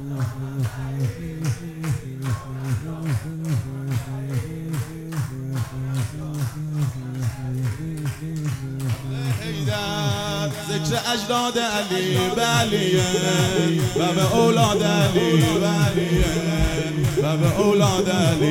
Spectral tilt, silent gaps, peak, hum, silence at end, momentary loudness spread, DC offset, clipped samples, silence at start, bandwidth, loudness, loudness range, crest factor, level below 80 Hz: -5 dB/octave; none; -4 dBFS; none; 0 s; 10 LU; under 0.1%; under 0.1%; 0 s; 16.5 kHz; -22 LUFS; 9 LU; 18 dB; -38 dBFS